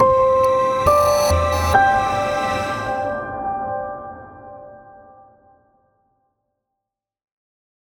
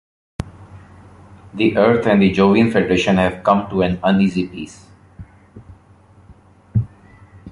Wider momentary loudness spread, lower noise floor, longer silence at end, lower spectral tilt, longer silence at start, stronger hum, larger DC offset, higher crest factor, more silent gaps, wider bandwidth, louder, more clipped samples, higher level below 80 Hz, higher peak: first, 22 LU vs 19 LU; first, -84 dBFS vs -48 dBFS; first, 3.15 s vs 0 s; second, -4.5 dB/octave vs -7 dB/octave; second, 0 s vs 0.4 s; neither; neither; about the same, 18 dB vs 16 dB; neither; first, 19.5 kHz vs 11 kHz; about the same, -18 LUFS vs -16 LUFS; neither; about the same, -38 dBFS vs -42 dBFS; about the same, -2 dBFS vs -2 dBFS